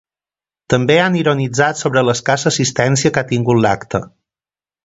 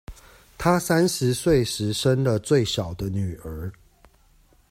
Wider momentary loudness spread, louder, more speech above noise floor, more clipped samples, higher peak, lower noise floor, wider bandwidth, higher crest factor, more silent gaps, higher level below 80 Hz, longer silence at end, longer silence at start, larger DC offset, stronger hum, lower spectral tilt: second, 5 LU vs 13 LU; first, -15 LUFS vs -23 LUFS; first, over 75 dB vs 35 dB; neither; first, 0 dBFS vs -8 dBFS; first, under -90 dBFS vs -58 dBFS; second, 8 kHz vs 16 kHz; about the same, 16 dB vs 16 dB; neither; about the same, -48 dBFS vs -44 dBFS; second, 0.75 s vs 1 s; first, 0.7 s vs 0.1 s; neither; neither; about the same, -4.5 dB/octave vs -5.5 dB/octave